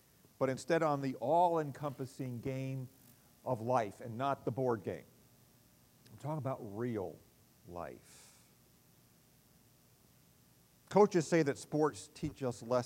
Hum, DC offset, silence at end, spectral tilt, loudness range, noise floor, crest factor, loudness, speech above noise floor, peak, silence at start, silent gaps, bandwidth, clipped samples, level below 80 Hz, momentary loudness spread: 60 Hz at -70 dBFS; under 0.1%; 0 s; -6.5 dB/octave; 13 LU; -66 dBFS; 24 dB; -36 LUFS; 31 dB; -14 dBFS; 0.4 s; none; 16 kHz; under 0.1%; -70 dBFS; 17 LU